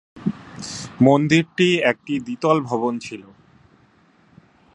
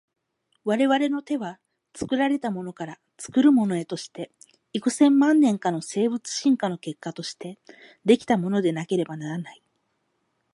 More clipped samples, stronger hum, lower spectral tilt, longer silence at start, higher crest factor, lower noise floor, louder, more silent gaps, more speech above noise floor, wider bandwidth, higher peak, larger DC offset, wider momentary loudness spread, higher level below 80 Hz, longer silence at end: neither; neither; about the same, -5.5 dB/octave vs -5.5 dB/octave; second, 0.15 s vs 0.65 s; about the same, 20 dB vs 18 dB; second, -56 dBFS vs -73 dBFS; first, -20 LUFS vs -24 LUFS; neither; second, 37 dB vs 50 dB; about the same, 11 kHz vs 11.5 kHz; first, 0 dBFS vs -6 dBFS; neither; about the same, 16 LU vs 18 LU; first, -60 dBFS vs -68 dBFS; first, 1.55 s vs 1 s